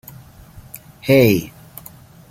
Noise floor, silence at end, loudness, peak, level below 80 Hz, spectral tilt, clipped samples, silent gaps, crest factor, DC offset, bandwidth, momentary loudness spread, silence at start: -42 dBFS; 0.85 s; -16 LUFS; -2 dBFS; -48 dBFS; -6.5 dB/octave; under 0.1%; none; 18 dB; under 0.1%; 17 kHz; 25 LU; 1.05 s